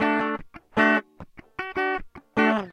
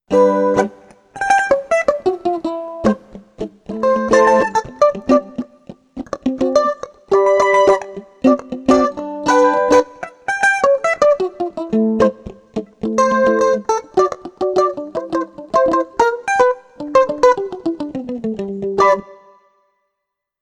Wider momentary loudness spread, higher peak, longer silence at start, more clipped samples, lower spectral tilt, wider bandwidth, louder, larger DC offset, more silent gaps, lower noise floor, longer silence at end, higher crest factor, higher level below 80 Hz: about the same, 14 LU vs 13 LU; second, -6 dBFS vs -2 dBFS; about the same, 0 s vs 0.1 s; neither; about the same, -6 dB/octave vs -5 dB/octave; second, 9.8 kHz vs 11 kHz; second, -25 LUFS vs -16 LUFS; neither; neither; second, -46 dBFS vs -78 dBFS; second, 0 s vs 1.3 s; first, 20 dB vs 14 dB; about the same, -52 dBFS vs -50 dBFS